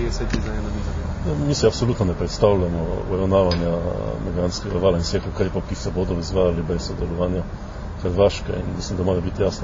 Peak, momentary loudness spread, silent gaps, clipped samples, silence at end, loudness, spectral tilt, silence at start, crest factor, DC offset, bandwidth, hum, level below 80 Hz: -2 dBFS; 8 LU; none; under 0.1%; 0 s; -22 LUFS; -6.5 dB/octave; 0 s; 18 dB; under 0.1%; 7.6 kHz; none; -30 dBFS